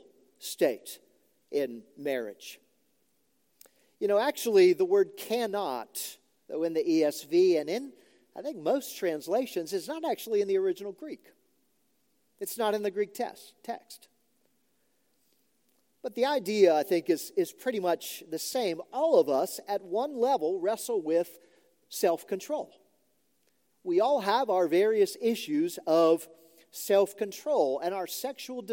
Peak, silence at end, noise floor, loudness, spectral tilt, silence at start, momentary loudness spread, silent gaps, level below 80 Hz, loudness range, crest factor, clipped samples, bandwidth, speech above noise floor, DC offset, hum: -10 dBFS; 0 s; -74 dBFS; -29 LUFS; -4 dB/octave; 0.4 s; 16 LU; none; under -90 dBFS; 9 LU; 20 dB; under 0.1%; 17 kHz; 46 dB; under 0.1%; none